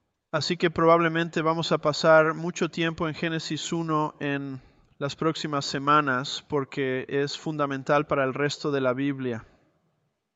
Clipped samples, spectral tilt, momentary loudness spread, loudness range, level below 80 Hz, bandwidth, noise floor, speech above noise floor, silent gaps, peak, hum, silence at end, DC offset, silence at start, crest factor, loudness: under 0.1%; -5 dB/octave; 10 LU; 5 LU; -62 dBFS; 8.2 kHz; -74 dBFS; 48 dB; none; -6 dBFS; none; 0.9 s; under 0.1%; 0.35 s; 20 dB; -25 LUFS